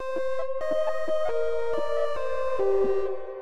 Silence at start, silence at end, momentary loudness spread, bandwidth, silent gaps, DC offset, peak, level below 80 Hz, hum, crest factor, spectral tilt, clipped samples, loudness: 0 s; 0 s; 5 LU; 11 kHz; none; 5%; -14 dBFS; -54 dBFS; none; 12 dB; -5.5 dB/octave; under 0.1%; -28 LUFS